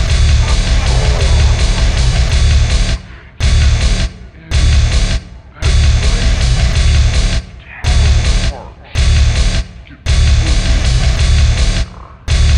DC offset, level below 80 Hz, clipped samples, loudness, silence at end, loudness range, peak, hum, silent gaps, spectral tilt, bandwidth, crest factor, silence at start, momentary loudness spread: under 0.1%; -12 dBFS; under 0.1%; -14 LUFS; 0 s; 1 LU; -2 dBFS; none; none; -4.5 dB/octave; 10.5 kHz; 10 dB; 0 s; 9 LU